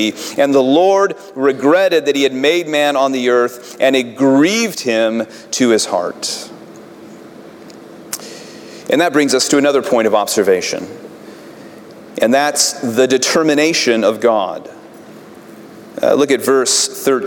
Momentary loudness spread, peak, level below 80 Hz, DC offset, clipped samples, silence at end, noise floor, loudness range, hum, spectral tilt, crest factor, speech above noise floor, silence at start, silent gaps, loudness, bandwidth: 15 LU; -2 dBFS; -66 dBFS; under 0.1%; under 0.1%; 0 s; -37 dBFS; 6 LU; none; -3 dB/octave; 14 dB; 23 dB; 0 s; none; -14 LUFS; 18 kHz